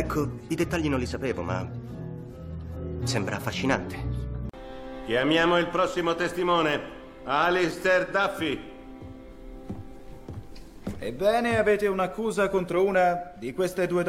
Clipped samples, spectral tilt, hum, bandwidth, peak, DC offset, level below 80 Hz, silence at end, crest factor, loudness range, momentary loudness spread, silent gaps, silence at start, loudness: under 0.1%; -5.5 dB/octave; none; 16 kHz; -6 dBFS; under 0.1%; -44 dBFS; 0 s; 20 dB; 7 LU; 19 LU; none; 0 s; -26 LUFS